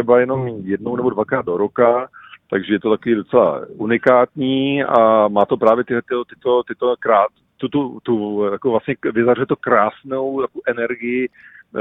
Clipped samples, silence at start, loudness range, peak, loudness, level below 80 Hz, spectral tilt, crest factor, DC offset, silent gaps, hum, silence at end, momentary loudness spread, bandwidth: under 0.1%; 0 s; 4 LU; 0 dBFS; -18 LUFS; -58 dBFS; -9 dB/octave; 18 dB; under 0.1%; none; none; 0 s; 9 LU; 4 kHz